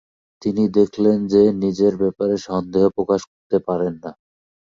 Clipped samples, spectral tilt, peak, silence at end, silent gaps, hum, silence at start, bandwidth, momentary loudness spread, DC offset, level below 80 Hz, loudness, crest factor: under 0.1%; -7.5 dB/octave; -2 dBFS; 0.55 s; 3.27-3.50 s; none; 0.45 s; 7.4 kHz; 9 LU; under 0.1%; -54 dBFS; -19 LUFS; 16 dB